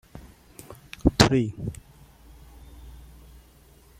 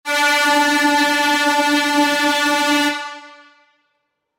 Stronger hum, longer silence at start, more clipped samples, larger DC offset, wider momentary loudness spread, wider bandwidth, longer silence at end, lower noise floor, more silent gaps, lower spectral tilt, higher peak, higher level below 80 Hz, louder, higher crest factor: neither; about the same, 0.15 s vs 0.05 s; neither; neither; first, 28 LU vs 3 LU; about the same, 16 kHz vs 17 kHz; about the same, 1.1 s vs 1.05 s; second, -54 dBFS vs -71 dBFS; neither; first, -5 dB/octave vs -0.5 dB/octave; first, 0 dBFS vs -6 dBFS; first, -40 dBFS vs -66 dBFS; second, -23 LUFS vs -15 LUFS; first, 28 dB vs 12 dB